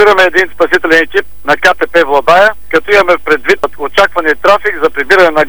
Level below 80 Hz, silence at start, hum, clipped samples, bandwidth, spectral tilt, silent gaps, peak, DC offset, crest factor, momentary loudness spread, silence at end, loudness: -40 dBFS; 0 s; none; 0.6%; over 20 kHz; -3.5 dB/octave; none; 0 dBFS; 8%; 10 dB; 6 LU; 0 s; -9 LUFS